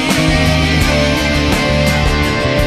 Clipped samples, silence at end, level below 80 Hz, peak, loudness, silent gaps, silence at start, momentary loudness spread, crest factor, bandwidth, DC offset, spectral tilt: under 0.1%; 0 s; -20 dBFS; 0 dBFS; -13 LUFS; none; 0 s; 2 LU; 12 dB; 14 kHz; under 0.1%; -5 dB/octave